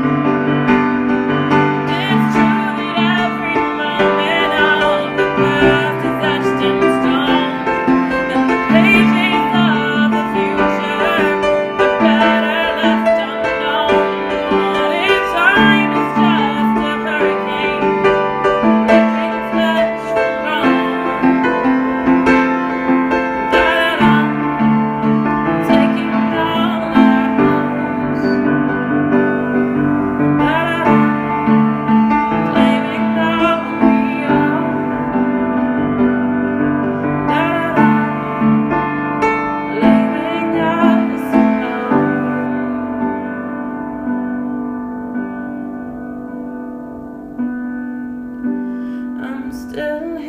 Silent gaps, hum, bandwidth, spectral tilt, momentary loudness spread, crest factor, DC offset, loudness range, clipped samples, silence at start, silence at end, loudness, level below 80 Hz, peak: none; none; 15 kHz; -6.5 dB/octave; 11 LU; 14 dB; under 0.1%; 8 LU; under 0.1%; 0 s; 0 s; -15 LUFS; -44 dBFS; 0 dBFS